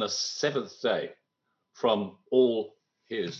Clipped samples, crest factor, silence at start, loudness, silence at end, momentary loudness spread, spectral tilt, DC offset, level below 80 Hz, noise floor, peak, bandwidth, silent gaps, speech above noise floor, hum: under 0.1%; 18 dB; 0 s; -28 LUFS; 0 s; 12 LU; -3.5 dB/octave; under 0.1%; -76 dBFS; -80 dBFS; -10 dBFS; 7.6 kHz; none; 52 dB; none